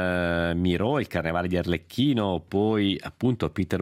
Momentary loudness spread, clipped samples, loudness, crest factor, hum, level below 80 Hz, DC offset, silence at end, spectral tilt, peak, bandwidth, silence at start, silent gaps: 4 LU; under 0.1%; -26 LUFS; 14 dB; none; -52 dBFS; under 0.1%; 0 s; -7 dB/octave; -10 dBFS; 15.5 kHz; 0 s; none